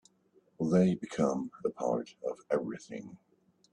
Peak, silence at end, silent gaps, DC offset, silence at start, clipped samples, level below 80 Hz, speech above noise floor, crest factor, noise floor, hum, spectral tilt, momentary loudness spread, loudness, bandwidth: -14 dBFS; 0.55 s; none; under 0.1%; 0.6 s; under 0.1%; -70 dBFS; 36 dB; 18 dB; -68 dBFS; none; -7.5 dB/octave; 16 LU; -33 LUFS; 9.8 kHz